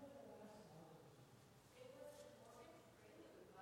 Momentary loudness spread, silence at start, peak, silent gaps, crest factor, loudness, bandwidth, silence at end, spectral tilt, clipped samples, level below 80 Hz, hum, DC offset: 7 LU; 0 s; -48 dBFS; none; 14 dB; -63 LUFS; 16.5 kHz; 0 s; -5 dB/octave; under 0.1%; -86 dBFS; none; under 0.1%